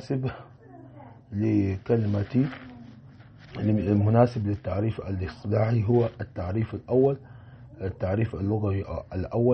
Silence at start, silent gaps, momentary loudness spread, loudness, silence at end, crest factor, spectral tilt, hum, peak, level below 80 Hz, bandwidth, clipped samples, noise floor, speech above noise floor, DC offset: 0 s; none; 14 LU; -27 LUFS; 0 s; 18 dB; -10 dB/octave; none; -8 dBFS; -50 dBFS; 6.2 kHz; under 0.1%; -49 dBFS; 24 dB; under 0.1%